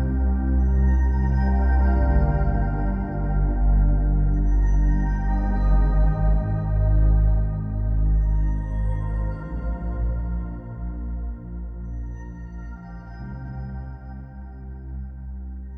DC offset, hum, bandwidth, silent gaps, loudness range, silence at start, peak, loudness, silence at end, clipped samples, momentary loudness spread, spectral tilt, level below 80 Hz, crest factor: under 0.1%; none; 2.2 kHz; none; 14 LU; 0 s; -8 dBFS; -24 LUFS; 0 s; under 0.1%; 16 LU; -10.5 dB/octave; -22 dBFS; 14 dB